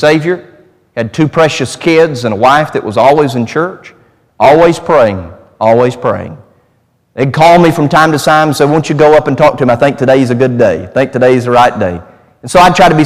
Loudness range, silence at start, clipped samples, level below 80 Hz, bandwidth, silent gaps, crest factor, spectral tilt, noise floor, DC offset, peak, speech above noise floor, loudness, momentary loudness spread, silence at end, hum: 3 LU; 0 s; 0.8%; -40 dBFS; 16 kHz; none; 8 dB; -6 dB/octave; -54 dBFS; under 0.1%; 0 dBFS; 46 dB; -9 LUFS; 11 LU; 0 s; none